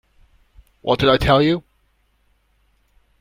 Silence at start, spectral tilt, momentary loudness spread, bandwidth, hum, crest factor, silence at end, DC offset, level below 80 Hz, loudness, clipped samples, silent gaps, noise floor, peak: 0.85 s; -6.5 dB/octave; 11 LU; 16 kHz; none; 20 dB; 1.6 s; under 0.1%; -38 dBFS; -17 LUFS; under 0.1%; none; -63 dBFS; 0 dBFS